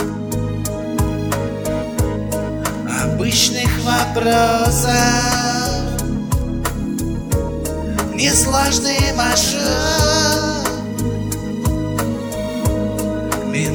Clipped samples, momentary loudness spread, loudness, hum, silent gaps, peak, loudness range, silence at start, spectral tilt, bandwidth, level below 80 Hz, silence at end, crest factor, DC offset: under 0.1%; 8 LU; -18 LUFS; none; none; -2 dBFS; 4 LU; 0 s; -4 dB/octave; over 20 kHz; -28 dBFS; 0 s; 16 dB; under 0.1%